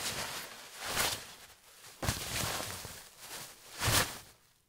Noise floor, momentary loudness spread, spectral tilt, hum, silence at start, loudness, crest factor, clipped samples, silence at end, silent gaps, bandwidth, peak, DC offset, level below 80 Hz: -58 dBFS; 19 LU; -2 dB/octave; none; 0 s; -35 LUFS; 24 dB; under 0.1%; 0.35 s; none; 16 kHz; -14 dBFS; under 0.1%; -54 dBFS